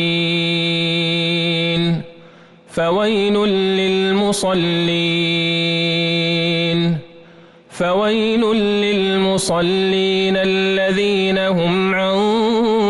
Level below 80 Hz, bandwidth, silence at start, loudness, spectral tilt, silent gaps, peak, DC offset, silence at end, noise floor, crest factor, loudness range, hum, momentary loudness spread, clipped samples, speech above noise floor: -50 dBFS; 12 kHz; 0 s; -16 LUFS; -5 dB/octave; none; -8 dBFS; under 0.1%; 0 s; -44 dBFS; 10 dB; 2 LU; none; 2 LU; under 0.1%; 28 dB